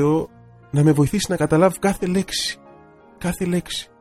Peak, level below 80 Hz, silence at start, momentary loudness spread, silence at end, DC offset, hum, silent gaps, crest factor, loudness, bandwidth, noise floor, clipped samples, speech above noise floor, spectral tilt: -2 dBFS; -44 dBFS; 0 s; 12 LU; 0.15 s; under 0.1%; none; none; 18 dB; -20 LUFS; 15 kHz; -48 dBFS; under 0.1%; 28 dB; -5.5 dB/octave